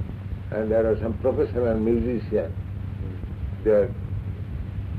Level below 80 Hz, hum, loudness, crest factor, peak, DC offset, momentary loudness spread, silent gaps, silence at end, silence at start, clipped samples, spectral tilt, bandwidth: -36 dBFS; none; -26 LUFS; 14 dB; -10 dBFS; under 0.1%; 11 LU; none; 0 s; 0 s; under 0.1%; -10.5 dB/octave; 4.9 kHz